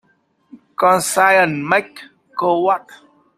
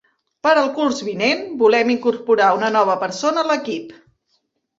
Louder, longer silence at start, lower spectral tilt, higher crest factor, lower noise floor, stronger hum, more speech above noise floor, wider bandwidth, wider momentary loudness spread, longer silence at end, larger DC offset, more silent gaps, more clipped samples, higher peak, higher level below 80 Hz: about the same, -16 LUFS vs -18 LUFS; about the same, 0.55 s vs 0.45 s; about the same, -3.5 dB/octave vs -4 dB/octave; about the same, 18 dB vs 16 dB; second, -61 dBFS vs -68 dBFS; neither; second, 45 dB vs 51 dB; first, 15.5 kHz vs 8 kHz; first, 16 LU vs 6 LU; second, 0.4 s vs 0.85 s; neither; neither; neither; about the same, 0 dBFS vs -2 dBFS; about the same, -64 dBFS vs -66 dBFS